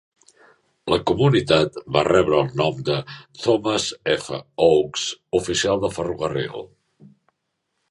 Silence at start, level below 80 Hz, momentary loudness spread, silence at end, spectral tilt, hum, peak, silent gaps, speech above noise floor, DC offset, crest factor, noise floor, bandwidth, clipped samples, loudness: 0.85 s; -50 dBFS; 9 LU; 1.25 s; -5 dB/octave; none; -2 dBFS; none; 55 dB; under 0.1%; 20 dB; -76 dBFS; 11.5 kHz; under 0.1%; -21 LUFS